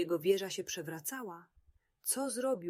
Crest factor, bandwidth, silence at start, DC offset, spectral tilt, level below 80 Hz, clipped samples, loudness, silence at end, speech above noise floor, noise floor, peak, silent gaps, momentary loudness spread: 18 dB; 16 kHz; 0 s; under 0.1%; -3.5 dB/octave; -76 dBFS; under 0.1%; -36 LUFS; 0 s; 23 dB; -59 dBFS; -18 dBFS; none; 13 LU